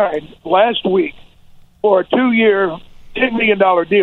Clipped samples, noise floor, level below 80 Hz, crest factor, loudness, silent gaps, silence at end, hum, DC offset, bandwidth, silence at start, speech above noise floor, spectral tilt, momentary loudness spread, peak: under 0.1%; -43 dBFS; -46 dBFS; 16 dB; -15 LUFS; none; 0 s; none; under 0.1%; 4.2 kHz; 0 s; 29 dB; -7.5 dB/octave; 11 LU; 0 dBFS